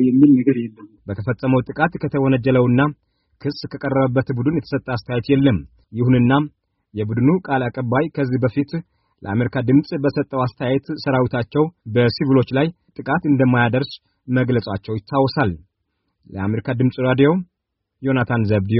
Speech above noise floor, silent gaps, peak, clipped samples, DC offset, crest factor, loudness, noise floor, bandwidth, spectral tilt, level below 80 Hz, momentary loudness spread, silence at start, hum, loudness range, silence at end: 58 dB; none; -2 dBFS; under 0.1%; under 0.1%; 16 dB; -19 LUFS; -76 dBFS; 5.8 kHz; -7 dB/octave; -50 dBFS; 12 LU; 0 s; none; 2 LU; 0 s